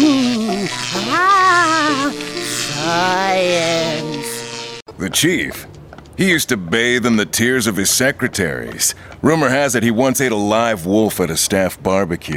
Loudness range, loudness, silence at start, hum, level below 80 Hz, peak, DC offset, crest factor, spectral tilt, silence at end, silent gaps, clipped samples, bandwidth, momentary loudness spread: 3 LU; -16 LUFS; 0 s; none; -46 dBFS; 0 dBFS; under 0.1%; 16 dB; -3.5 dB/octave; 0 s; 4.82-4.86 s; under 0.1%; 19 kHz; 9 LU